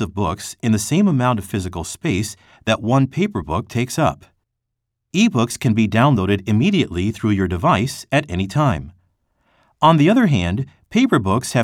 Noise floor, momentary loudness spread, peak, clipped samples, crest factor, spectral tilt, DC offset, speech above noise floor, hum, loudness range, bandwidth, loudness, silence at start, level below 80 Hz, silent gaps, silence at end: -78 dBFS; 9 LU; 0 dBFS; under 0.1%; 18 dB; -6 dB/octave; under 0.1%; 60 dB; none; 3 LU; 16 kHz; -18 LUFS; 0 s; -44 dBFS; none; 0 s